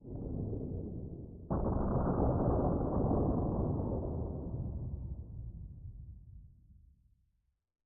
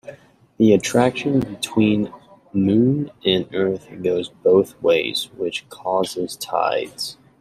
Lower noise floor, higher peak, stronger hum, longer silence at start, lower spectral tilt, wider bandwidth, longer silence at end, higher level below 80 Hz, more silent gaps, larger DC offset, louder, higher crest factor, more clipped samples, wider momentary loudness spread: first, -79 dBFS vs -48 dBFS; second, -20 dBFS vs -2 dBFS; neither; about the same, 0 s vs 0.05 s; first, -10 dB/octave vs -5.5 dB/octave; second, 1.8 kHz vs 15 kHz; first, 1.15 s vs 0.25 s; first, -44 dBFS vs -56 dBFS; neither; neither; second, -36 LUFS vs -20 LUFS; about the same, 16 dB vs 18 dB; neither; first, 18 LU vs 10 LU